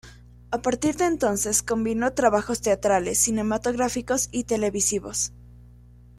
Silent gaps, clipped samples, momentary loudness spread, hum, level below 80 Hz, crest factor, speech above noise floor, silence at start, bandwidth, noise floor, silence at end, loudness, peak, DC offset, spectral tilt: none; under 0.1%; 5 LU; 60 Hz at -45 dBFS; -48 dBFS; 18 dB; 25 dB; 0.05 s; 15.5 kHz; -49 dBFS; 0.55 s; -24 LUFS; -6 dBFS; under 0.1%; -3.5 dB/octave